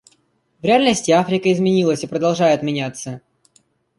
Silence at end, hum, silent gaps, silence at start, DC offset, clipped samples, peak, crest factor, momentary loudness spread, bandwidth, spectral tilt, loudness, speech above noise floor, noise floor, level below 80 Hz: 0.8 s; none; none; 0.65 s; under 0.1%; under 0.1%; -2 dBFS; 16 dB; 13 LU; 11.5 kHz; -5 dB/octave; -17 LUFS; 45 dB; -62 dBFS; -58 dBFS